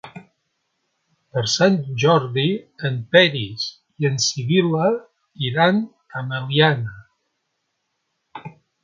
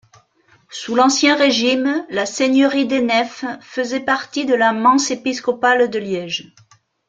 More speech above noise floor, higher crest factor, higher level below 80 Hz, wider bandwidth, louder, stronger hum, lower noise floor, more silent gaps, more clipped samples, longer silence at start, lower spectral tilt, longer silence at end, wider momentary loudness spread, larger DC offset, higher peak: first, 55 dB vs 39 dB; first, 22 dB vs 16 dB; about the same, -62 dBFS vs -64 dBFS; second, 7.8 kHz vs 9.2 kHz; about the same, -19 LUFS vs -17 LUFS; neither; first, -74 dBFS vs -56 dBFS; neither; neither; second, 0.05 s vs 0.7 s; first, -4.5 dB/octave vs -2.5 dB/octave; second, 0.35 s vs 0.65 s; about the same, 12 LU vs 11 LU; neither; about the same, 0 dBFS vs -2 dBFS